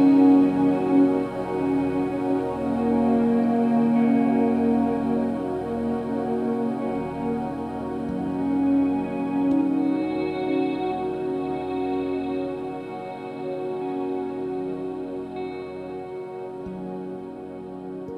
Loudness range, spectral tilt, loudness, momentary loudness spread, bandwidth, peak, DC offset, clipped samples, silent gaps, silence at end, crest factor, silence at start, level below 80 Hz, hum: 9 LU; -8.5 dB/octave; -24 LUFS; 14 LU; 5.2 kHz; -8 dBFS; under 0.1%; under 0.1%; none; 0 s; 16 dB; 0 s; -52 dBFS; none